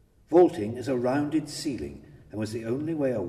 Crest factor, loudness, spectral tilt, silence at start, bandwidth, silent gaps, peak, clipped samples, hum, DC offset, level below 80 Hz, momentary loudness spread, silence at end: 20 dB; -27 LUFS; -6.5 dB/octave; 0.3 s; 13.5 kHz; none; -8 dBFS; under 0.1%; none; under 0.1%; -56 dBFS; 15 LU; 0 s